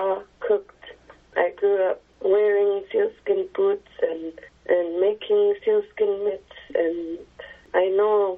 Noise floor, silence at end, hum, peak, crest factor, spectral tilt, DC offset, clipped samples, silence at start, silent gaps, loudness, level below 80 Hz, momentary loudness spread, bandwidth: -47 dBFS; 0 s; none; -6 dBFS; 16 dB; -2.5 dB/octave; under 0.1%; under 0.1%; 0 s; none; -23 LUFS; -62 dBFS; 12 LU; 3.8 kHz